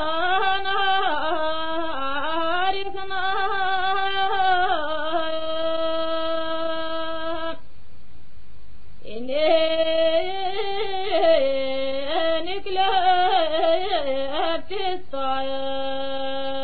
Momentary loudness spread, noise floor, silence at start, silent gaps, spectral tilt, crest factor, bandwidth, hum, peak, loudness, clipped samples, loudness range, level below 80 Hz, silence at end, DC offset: 9 LU; -51 dBFS; 0 s; none; -8 dB/octave; 16 dB; 4.9 kHz; none; -6 dBFS; -23 LUFS; under 0.1%; 6 LU; -52 dBFS; 0 s; 5%